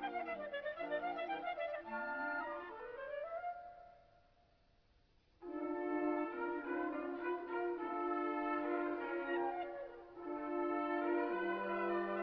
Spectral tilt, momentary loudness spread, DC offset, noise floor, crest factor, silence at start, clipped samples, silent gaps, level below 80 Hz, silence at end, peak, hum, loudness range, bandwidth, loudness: -3 dB/octave; 9 LU; under 0.1%; -72 dBFS; 16 dB; 0 s; under 0.1%; none; -74 dBFS; 0 s; -26 dBFS; none; 7 LU; 5.4 kHz; -41 LUFS